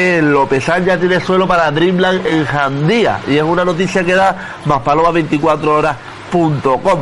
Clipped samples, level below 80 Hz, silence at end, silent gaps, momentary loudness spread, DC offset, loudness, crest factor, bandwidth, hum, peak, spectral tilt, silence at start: under 0.1%; -40 dBFS; 0 s; none; 4 LU; under 0.1%; -13 LUFS; 12 dB; 11.5 kHz; none; 0 dBFS; -6 dB/octave; 0 s